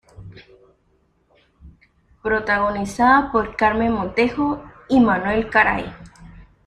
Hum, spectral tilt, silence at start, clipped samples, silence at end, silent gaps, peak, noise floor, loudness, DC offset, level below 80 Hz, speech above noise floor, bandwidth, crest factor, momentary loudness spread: none; -6 dB/octave; 0.2 s; under 0.1%; 0.25 s; none; -2 dBFS; -62 dBFS; -19 LUFS; under 0.1%; -44 dBFS; 44 dB; 11 kHz; 18 dB; 9 LU